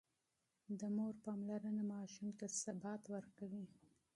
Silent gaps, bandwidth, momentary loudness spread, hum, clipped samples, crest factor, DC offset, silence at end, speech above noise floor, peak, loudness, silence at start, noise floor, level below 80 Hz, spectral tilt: none; 11.5 kHz; 8 LU; none; under 0.1%; 16 dB; under 0.1%; 0.45 s; 42 dB; -30 dBFS; -47 LUFS; 0.7 s; -88 dBFS; -88 dBFS; -5.5 dB/octave